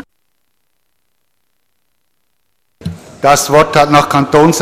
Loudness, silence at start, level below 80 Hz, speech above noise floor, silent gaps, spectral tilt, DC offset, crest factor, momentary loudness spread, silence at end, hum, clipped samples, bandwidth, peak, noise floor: -9 LUFS; 2.85 s; -42 dBFS; 59 dB; none; -4.5 dB/octave; under 0.1%; 14 dB; 19 LU; 0 s; none; under 0.1%; 16 kHz; 0 dBFS; -67 dBFS